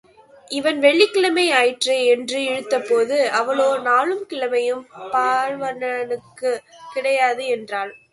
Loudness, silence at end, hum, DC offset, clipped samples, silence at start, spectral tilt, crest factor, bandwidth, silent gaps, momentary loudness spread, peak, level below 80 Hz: -19 LUFS; 0.15 s; none; under 0.1%; under 0.1%; 0.5 s; -2 dB/octave; 18 dB; 11.5 kHz; none; 10 LU; -2 dBFS; -72 dBFS